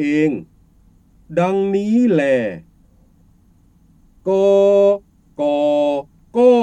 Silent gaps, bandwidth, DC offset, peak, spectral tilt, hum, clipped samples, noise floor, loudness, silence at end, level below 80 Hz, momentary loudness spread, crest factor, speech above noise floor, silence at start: none; 9 kHz; under 0.1%; -2 dBFS; -7.5 dB/octave; none; under 0.1%; -52 dBFS; -17 LUFS; 0 s; -54 dBFS; 13 LU; 16 dB; 38 dB; 0 s